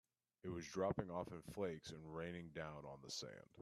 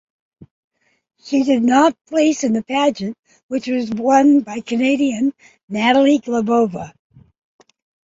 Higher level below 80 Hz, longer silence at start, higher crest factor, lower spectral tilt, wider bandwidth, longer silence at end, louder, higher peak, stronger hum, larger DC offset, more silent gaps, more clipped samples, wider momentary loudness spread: second, -72 dBFS vs -60 dBFS; second, 0.45 s vs 1.25 s; about the same, 20 dB vs 16 dB; about the same, -5 dB/octave vs -4.5 dB/octave; first, 13.5 kHz vs 7.8 kHz; second, 0 s vs 1.2 s; second, -48 LUFS vs -17 LUFS; second, -28 dBFS vs -2 dBFS; neither; neither; second, none vs 3.19-3.23 s, 3.43-3.49 s, 5.63-5.68 s; neither; about the same, 10 LU vs 12 LU